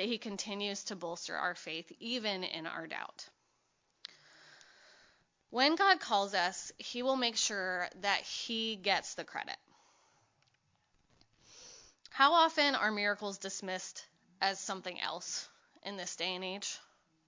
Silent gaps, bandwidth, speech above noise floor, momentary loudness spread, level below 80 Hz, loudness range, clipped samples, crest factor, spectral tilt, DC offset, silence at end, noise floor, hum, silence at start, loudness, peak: none; 7.8 kHz; 42 dB; 19 LU; -82 dBFS; 9 LU; under 0.1%; 26 dB; -1.5 dB/octave; under 0.1%; 0.45 s; -77 dBFS; none; 0 s; -34 LUFS; -12 dBFS